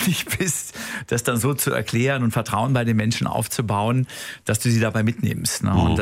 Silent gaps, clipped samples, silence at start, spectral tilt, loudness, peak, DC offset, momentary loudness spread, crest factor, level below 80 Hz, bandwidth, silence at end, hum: none; under 0.1%; 0 s; -5 dB/octave; -22 LUFS; -6 dBFS; under 0.1%; 5 LU; 14 dB; -42 dBFS; 16 kHz; 0 s; none